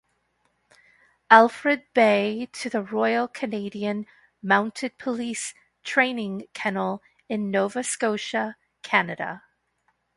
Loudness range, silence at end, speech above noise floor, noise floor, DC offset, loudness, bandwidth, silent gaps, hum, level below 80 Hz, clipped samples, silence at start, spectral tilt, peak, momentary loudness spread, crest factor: 5 LU; 0.8 s; 47 dB; -71 dBFS; under 0.1%; -24 LUFS; 11.5 kHz; none; 60 Hz at -70 dBFS; -72 dBFS; under 0.1%; 1.3 s; -4 dB/octave; 0 dBFS; 14 LU; 24 dB